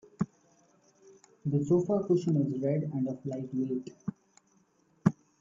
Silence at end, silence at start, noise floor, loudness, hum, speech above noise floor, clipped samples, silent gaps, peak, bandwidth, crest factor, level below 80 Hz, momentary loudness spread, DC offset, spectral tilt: 0.3 s; 0.2 s; -69 dBFS; -31 LUFS; none; 39 dB; under 0.1%; none; -8 dBFS; 7.6 kHz; 24 dB; -68 dBFS; 11 LU; under 0.1%; -9.5 dB/octave